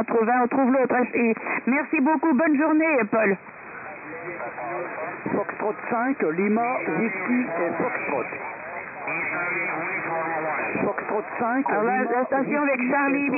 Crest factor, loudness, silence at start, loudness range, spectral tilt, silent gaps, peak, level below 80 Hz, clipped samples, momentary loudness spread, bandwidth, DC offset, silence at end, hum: 12 dB; -24 LUFS; 0 s; 5 LU; -10.5 dB/octave; none; -12 dBFS; -70 dBFS; under 0.1%; 12 LU; 2.8 kHz; under 0.1%; 0 s; none